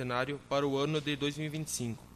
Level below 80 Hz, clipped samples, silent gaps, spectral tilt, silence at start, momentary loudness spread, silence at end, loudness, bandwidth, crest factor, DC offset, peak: -62 dBFS; under 0.1%; none; -4.5 dB/octave; 0 s; 5 LU; 0 s; -34 LUFS; 13.5 kHz; 16 dB; under 0.1%; -18 dBFS